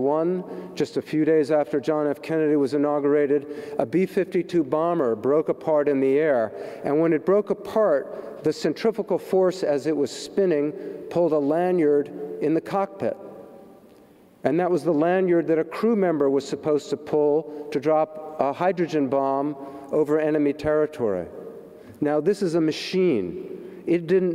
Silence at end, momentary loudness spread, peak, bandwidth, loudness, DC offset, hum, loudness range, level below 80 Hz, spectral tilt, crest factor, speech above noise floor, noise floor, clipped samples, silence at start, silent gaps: 0 s; 9 LU; -6 dBFS; 13.5 kHz; -23 LUFS; under 0.1%; none; 2 LU; -64 dBFS; -7 dB/octave; 16 dB; 30 dB; -52 dBFS; under 0.1%; 0 s; none